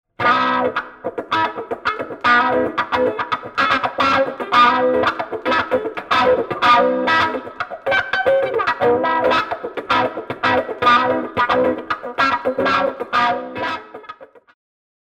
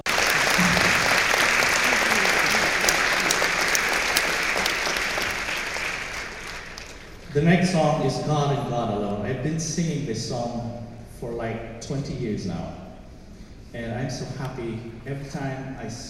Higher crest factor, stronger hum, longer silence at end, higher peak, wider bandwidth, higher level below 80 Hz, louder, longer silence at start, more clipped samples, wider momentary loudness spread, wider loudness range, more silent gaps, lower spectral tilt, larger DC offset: second, 16 dB vs 22 dB; neither; first, 0.8 s vs 0 s; about the same, -2 dBFS vs -2 dBFS; second, 9.8 kHz vs 16.5 kHz; second, -54 dBFS vs -44 dBFS; first, -18 LUFS vs -22 LUFS; first, 0.2 s vs 0.05 s; neither; second, 11 LU vs 16 LU; second, 3 LU vs 14 LU; neither; about the same, -4.5 dB/octave vs -3.5 dB/octave; neither